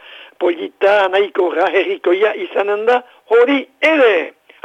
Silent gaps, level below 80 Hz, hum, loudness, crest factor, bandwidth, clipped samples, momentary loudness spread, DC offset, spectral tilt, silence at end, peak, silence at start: none; -68 dBFS; none; -15 LUFS; 12 dB; 8.4 kHz; under 0.1%; 7 LU; under 0.1%; -4 dB/octave; 0.35 s; -4 dBFS; 0.1 s